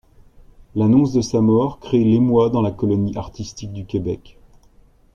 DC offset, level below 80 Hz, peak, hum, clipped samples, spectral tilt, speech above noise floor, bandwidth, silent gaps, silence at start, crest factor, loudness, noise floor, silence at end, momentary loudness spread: under 0.1%; -44 dBFS; -4 dBFS; none; under 0.1%; -8 dB/octave; 34 dB; 7.2 kHz; none; 0.75 s; 16 dB; -18 LUFS; -51 dBFS; 0.95 s; 15 LU